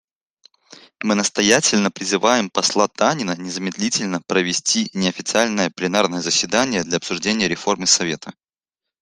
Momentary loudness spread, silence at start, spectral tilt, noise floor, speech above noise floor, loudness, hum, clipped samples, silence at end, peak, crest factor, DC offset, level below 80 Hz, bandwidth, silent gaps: 8 LU; 0.7 s; -2.5 dB/octave; -85 dBFS; 66 dB; -19 LUFS; none; under 0.1%; 0.7 s; 0 dBFS; 20 dB; under 0.1%; -60 dBFS; 13 kHz; none